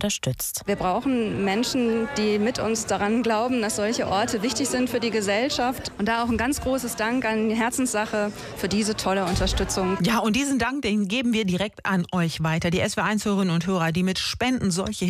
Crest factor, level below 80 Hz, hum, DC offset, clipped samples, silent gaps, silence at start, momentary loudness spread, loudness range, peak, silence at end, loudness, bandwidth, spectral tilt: 14 dB; -42 dBFS; none; under 0.1%; under 0.1%; none; 0 s; 3 LU; 1 LU; -10 dBFS; 0 s; -24 LUFS; 16 kHz; -4.5 dB/octave